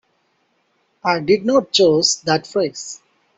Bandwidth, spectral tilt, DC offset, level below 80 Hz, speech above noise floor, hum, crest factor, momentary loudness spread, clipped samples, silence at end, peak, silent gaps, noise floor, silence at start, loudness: 8.2 kHz; -3.5 dB/octave; under 0.1%; -60 dBFS; 48 dB; none; 16 dB; 16 LU; under 0.1%; 0.4 s; -2 dBFS; none; -65 dBFS; 1.05 s; -17 LUFS